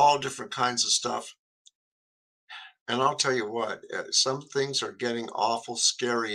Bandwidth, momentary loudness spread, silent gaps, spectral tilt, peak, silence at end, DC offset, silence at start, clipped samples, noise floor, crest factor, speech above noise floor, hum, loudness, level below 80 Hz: 14 kHz; 12 LU; 1.39-1.65 s, 1.75-2.48 s, 2.80-2.86 s; -1.5 dB/octave; -10 dBFS; 0 s; under 0.1%; 0 s; under 0.1%; under -90 dBFS; 20 dB; over 63 dB; none; -27 LUFS; -74 dBFS